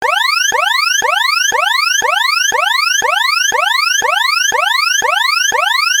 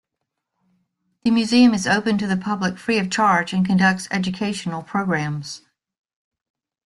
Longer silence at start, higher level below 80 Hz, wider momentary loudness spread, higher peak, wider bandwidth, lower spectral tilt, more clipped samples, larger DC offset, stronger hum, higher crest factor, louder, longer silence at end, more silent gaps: second, 0 s vs 1.25 s; about the same, -58 dBFS vs -58 dBFS; second, 1 LU vs 11 LU; about the same, -2 dBFS vs -4 dBFS; first, 17.5 kHz vs 11.5 kHz; second, 2.5 dB/octave vs -5 dB/octave; neither; neither; neither; second, 12 dB vs 18 dB; first, -11 LUFS vs -20 LUFS; second, 0 s vs 1.3 s; neither